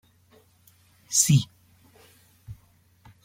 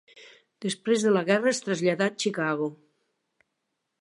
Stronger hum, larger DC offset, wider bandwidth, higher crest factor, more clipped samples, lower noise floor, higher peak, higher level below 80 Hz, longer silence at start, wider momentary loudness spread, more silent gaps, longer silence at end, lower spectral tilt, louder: neither; neither; first, 16.5 kHz vs 11.5 kHz; about the same, 24 dB vs 20 dB; neither; second, -60 dBFS vs -80 dBFS; about the same, -6 dBFS vs -8 dBFS; first, -60 dBFS vs -80 dBFS; first, 1.1 s vs 0.15 s; first, 28 LU vs 10 LU; neither; second, 0.7 s vs 1.3 s; about the same, -3.5 dB/octave vs -4.5 dB/octave; first, -21 LUFS vs -26 LUFS